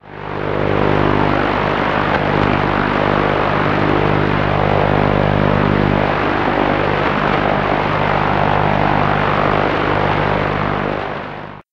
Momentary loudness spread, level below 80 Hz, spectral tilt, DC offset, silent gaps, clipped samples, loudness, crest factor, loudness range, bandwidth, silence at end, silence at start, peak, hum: 4 LU; -32 dBFS; -8 dB/octave; under 0.1%; none; under 0.1%; -15 LUFS; 14 dB; 1 LU; 6.8 kHz; 0.1 s; 0.05 s; -2 dBFS; 50 Hz at -20 dBFS